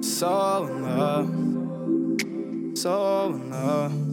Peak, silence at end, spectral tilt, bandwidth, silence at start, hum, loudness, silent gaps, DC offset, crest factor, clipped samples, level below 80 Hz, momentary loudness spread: -10 dBFS; 0 s; -5.5 dB/octave; 18 kHz; 0 s; none; -26 LUFS; none; under 0.1%; 14 dB; under 0.1%; -74 dBFS; 5 LU